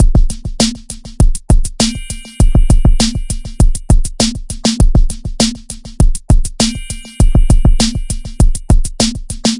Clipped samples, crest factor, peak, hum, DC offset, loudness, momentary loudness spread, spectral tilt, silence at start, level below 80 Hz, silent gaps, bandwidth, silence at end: under 0.1%; 10 dB; 0 dBFS; none; under 0.1%; -15 LUFS; 12 LU; -4.5 dB/octave; 0 s; -12 dBFS; none; 11.5 kHz; 0 s